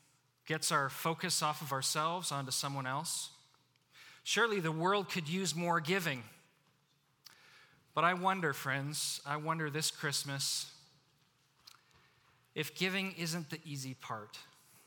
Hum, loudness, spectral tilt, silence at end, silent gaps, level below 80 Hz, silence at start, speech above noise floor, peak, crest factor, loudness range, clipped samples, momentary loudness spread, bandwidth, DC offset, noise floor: none; -35 LUFS; -3 dB/octave; 0.4 s; none; -86 dBFS; 0.45 s; 38 dB; -16 dBFS; 22 dB; 6 LU; under 0.1%; 12 LU; over 20 kHz; under 0.1%; -74 dBFS